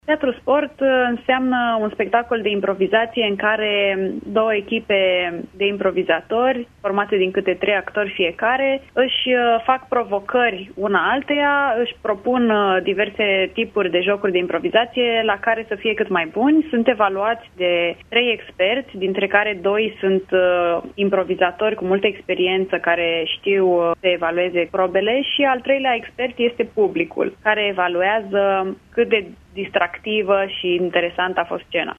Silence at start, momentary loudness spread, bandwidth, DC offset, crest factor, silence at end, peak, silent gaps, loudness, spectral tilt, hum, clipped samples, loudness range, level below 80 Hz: 0.05 s; 5 LU; 3.8 kHz; under 0.1%; 18 dB; 0.05 s; -2 dBFS; none; -19 LUFS; -6.5 dB/octave; none; under 0.1%; 1 LU; -54 dBFS